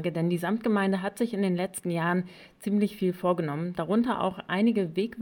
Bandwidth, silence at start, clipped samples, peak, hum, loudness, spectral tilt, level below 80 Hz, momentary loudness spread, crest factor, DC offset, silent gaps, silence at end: 18.5 kHz; 0 s; under 0.1%; -14 dBFS; none; -28 LUFS; -6.5 dB/octave; -66 dBFS; 5 LU; 14 dB; under 0.1%; none; 0 s